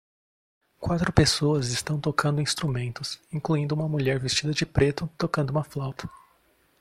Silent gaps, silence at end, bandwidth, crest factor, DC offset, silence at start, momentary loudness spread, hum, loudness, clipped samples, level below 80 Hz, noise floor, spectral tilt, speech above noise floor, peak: none; 0.65 s; 14.5 kHz; 26 dB; under 0.1%; 0.8 s; 12 LU; none; -26 LUFS; under 0.1%; -46 dBFS; -64 dBFS; -5 dB/octave; 39 dB; -2 dBFS